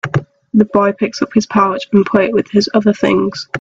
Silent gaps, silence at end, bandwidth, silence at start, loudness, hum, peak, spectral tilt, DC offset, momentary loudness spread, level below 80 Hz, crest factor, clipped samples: none; 0.05 s; 7.6 kHz; 0.05 s; -14 LUFS; none; 0 dBFS; -6.5 dB/octave; under 0.1%; 6 LU; -50 dBFS; 14 dB; under 0.1%